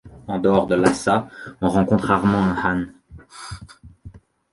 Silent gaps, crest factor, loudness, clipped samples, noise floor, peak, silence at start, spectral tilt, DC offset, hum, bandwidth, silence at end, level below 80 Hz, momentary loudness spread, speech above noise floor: none; 20 dB; -20 LUFS; under 0.1%; -44 dBFS; -2 dBFS; 0.05 s; -6.5 dB/octave; under 0.1%; none; 11.5 kHz; 0.35 s; -44 dBFS; 19 LU; 25 dB